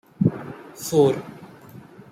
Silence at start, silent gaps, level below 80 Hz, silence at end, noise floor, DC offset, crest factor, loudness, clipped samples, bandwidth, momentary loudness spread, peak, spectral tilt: 0.2 s; none; -60 dBFS; 0.35 s; -44 dBFS; under 0.1%; 20 dB; -22 LUFS; under 0.1%; 16 kHz; 24 LU; -6 dBFS; -6.5 dB/octave